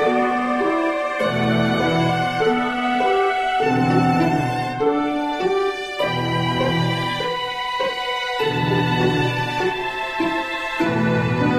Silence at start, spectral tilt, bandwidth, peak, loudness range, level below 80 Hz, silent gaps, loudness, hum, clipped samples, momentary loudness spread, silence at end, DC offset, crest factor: 0 s; -6 dB/octave; 14.5 kHz; -4 dBFS; 2 LU; -48 dBFS; none; -20 LUFS; none; under 0.1%; 5 LU; 0 s; under 0.1%; 16 dB